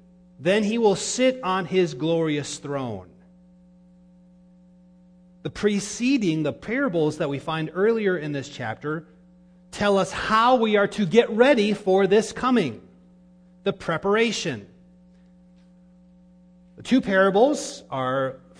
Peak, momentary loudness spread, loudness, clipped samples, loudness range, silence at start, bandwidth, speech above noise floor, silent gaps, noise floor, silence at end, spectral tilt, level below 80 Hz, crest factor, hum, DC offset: -4 dBFS; 12 LU; -23 LUFS; under 0.1%; 9 LU; 0.4 s; 10.5 kHz; 31 dB; none; -53 dBFS; 0.25 s; -5 dB/octave; -58 dBFS; 20 dB; none; under 0.1%